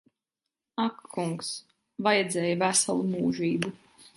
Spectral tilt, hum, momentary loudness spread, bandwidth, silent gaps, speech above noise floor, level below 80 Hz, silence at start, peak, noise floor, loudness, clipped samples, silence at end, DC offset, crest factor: -3.5 dB/octave; none; 12 LU; 11.5 kHz; none; 61 dB; -70 dBFS; 0.75 s; -8 dBFS; -88 dBFS; -28 LUFS; under 0.1%; 0.1 s; under 0.1%; 22 dB